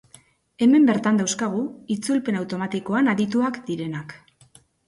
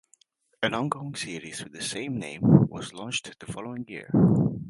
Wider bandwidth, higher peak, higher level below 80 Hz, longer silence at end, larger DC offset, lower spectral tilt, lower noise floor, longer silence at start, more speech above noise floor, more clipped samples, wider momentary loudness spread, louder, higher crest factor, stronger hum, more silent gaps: about the same, 11.5 kHz vs 11.5 kHz; second, -8 dBFS vs -2 dBFS; second, -66 dBFS vs -54 dBFS; first, 0.7 s vs 0 s; neither; about the same, -5 dB/octave vs -6 dB/octave; second, -55 dBFS vs -64 dBFS; about the same, 0.6 s vs 0.6 s; second, 34 dB vs 39 dB; neither; second, 12 LU vs 16 LU; first, -22 LUFS vs -26 LUFS; second, 14 dB vs 24 dB; neither; neither